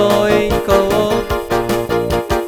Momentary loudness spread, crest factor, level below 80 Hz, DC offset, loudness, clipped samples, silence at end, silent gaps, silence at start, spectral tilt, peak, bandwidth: 5 LU; 14 dB; -30 dBFS; under 0.1%; -15 LUFS; under 0.1%; 0 s; none; 0 s; -5.5 dB/octave; 0 dBFS; 19.5 kHz